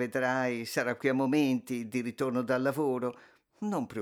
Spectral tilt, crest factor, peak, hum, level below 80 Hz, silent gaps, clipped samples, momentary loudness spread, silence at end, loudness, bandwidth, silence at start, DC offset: -6 dB/octave; 16 dB; -14 dBFS; none; -78 dBFS; none; under 0.1%; 7 LU; 0 s; -31 LUFS; 18 kHz; 0 s; under 0.1%